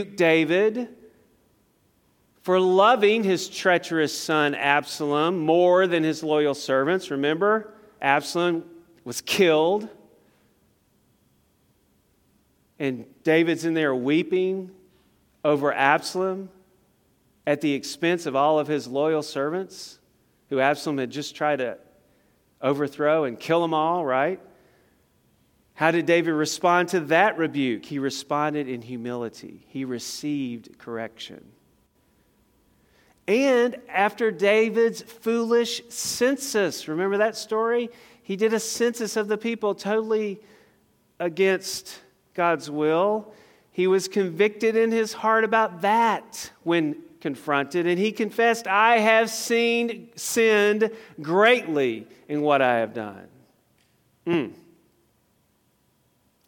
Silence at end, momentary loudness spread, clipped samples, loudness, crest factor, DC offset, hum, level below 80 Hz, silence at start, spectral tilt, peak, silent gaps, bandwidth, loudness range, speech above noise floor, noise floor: 1.9 s; 13 LU; under 0.1%; -23 LUFS; 22 dB; under 0.1%; none; -72 dBFS; 0 s; -4.5 dB/octave; -2 dBFS; none; 17.5 kHz; 7 LU; 43 dB; -66 dBFS